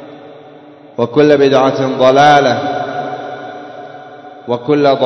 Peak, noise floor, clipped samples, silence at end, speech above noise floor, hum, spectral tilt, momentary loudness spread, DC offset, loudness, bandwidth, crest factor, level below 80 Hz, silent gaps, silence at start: 0 dBFS; -37 dBFS; 0.3%; 0 s; 28 dB; none; -6 dB/octave; 23 LU; under 0.1%; -11 LUFS; 7.2 kHz; 14 dB; -58 dBFS; none; 0 s